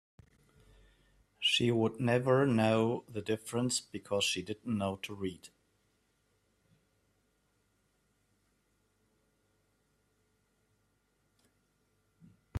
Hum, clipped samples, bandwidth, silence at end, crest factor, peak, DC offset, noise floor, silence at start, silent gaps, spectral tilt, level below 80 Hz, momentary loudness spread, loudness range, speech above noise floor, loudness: none; under 0.1%; 13.5 kHz; 0 s; 22 dB; -16 dBFS; under 0.1%; -76 dBFS; 1.4 s; none; -4.5 dB/octave; -68 dBFS; 11 LU; 12 LU; 44 dB; -32 LUFS